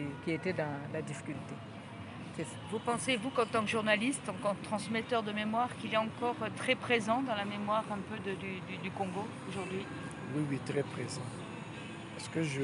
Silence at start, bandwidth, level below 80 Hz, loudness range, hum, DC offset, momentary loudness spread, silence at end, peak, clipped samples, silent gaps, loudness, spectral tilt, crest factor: 0 s; 11.5 kHz; -72 dBFS; 5 LU; none; under 0.1%; 13 LU; 0 s; -14 dBFS; under 0.1%; none; -36 LUFS; -5 dB/octave; 22 dB